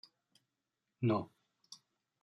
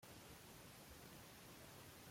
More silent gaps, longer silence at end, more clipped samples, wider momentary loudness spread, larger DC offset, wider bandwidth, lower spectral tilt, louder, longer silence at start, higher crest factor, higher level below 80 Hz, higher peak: neither; first, 0.5 s vs 0 s; neither; first, 22 LU vs 1 LU; neither; second, 11 kHz vs 16.5 kHz; first, -7.5 dB/octave vs -3.5 dB/octave; first, -36 LUFS vs -59 LUFS; first, 1 s vs 0 s; first, 20 dB vs 12 dB; second, -82 dBFS vs -74 dBFS; first, -22 dBFS vs -48 dBFS